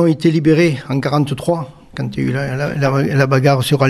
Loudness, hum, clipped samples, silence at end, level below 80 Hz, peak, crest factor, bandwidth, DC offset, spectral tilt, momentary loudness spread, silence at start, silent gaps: -16 LUFS; none; under 0.1%; 0 s; -46 dBFS; 0 dBFS; 14 dB; 13.5 kHz; under 0.1%; -7 dB/octave; 9 LU; 0 s; none